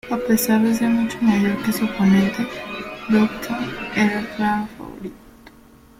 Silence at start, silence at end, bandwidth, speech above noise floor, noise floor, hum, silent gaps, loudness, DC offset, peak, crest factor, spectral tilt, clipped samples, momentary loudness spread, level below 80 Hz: 0.05 s; 0.5 s; 16.5 kHz; 29 dB; -48 dBFS; none; none; -20 LUFS; under 0.1%; -4 dBFS; 16 dB; -5.5 dB/octave; under 0.1%; 14 LU; -50 dBFS